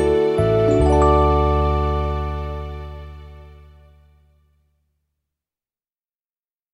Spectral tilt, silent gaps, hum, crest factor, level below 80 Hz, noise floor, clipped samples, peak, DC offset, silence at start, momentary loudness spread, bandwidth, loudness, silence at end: -8 dB/octave; none; none; 18 dB; -26 dBFS; under -90 dBFS; under 0.1%; -4 dBFS; under 0.1%; 0 s; 20 LU; 10.5 kHz; -18 LUFS; 3.2 s